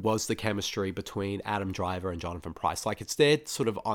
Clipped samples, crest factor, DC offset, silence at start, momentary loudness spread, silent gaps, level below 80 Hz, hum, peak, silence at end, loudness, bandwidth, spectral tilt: under 0.1%; 18 dB; under 0.1%; 0 s; 10 LU; none; -54 dBFS; none; -12 dBFS; 0 s; -30 LUFS; 18.5 kHz; -4.5 dB/octave